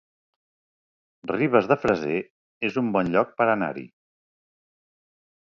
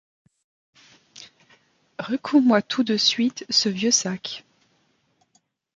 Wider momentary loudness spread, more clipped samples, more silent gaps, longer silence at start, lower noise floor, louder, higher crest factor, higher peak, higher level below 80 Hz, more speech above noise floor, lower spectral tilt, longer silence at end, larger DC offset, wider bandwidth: second, 11 LU vs 16 LU; neither; first, 2.30-2.61 s vs none; about the same, 1.25 s vs 1.2 s; first, under -90 dBFS vs -67 dBFS; second, -24 LUFS vs -21 LUFS; about the same, 22 dB vs 20 dB; about the same, -6 dBFS vs -4 dBFS; first, -60 dBFS vs -72 dBFS; first, over 67 dB vs 46 dB; first, -7.5 dB/octave vs -3 dB/octave; first, 1.6 s vs 1.35 s; neither; second, 7.6 kHz vs 9.2 kHz